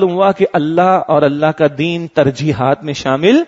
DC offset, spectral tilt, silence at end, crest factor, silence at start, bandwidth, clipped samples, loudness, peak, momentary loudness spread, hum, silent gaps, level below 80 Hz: under 0.1%; -6.5 dB/octave; 0 s; 12 dB; 0 s; 8 kHz; under 0.1%; -13 LUFS; 0 dBFS; 4 LU; none; none; -50 dBFS